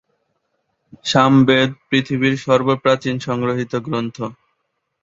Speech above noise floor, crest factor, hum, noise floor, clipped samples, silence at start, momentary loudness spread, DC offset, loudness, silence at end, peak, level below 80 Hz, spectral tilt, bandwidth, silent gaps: 55 dB; 18 dB; none; -72 dBFS; under 0.1%; 1.05 s; 13 LU; under 0.1%; -17 LUFS; 0.7 s; -2 dBFS; -56 dBFS; -6 dB/octave; 7.8 kHz; none